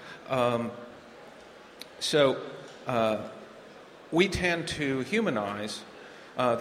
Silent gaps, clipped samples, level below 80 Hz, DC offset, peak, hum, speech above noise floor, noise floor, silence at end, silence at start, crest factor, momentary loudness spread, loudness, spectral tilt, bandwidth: none; under 0.1%; -56 dBFS; under 0.1%; -8 dBFS; none; 22 dB; -50 dBFS; 0 s; 0 s; 22 dB; 24 LU; -29 LUFS; -4.5 dB/octave; 16 kHz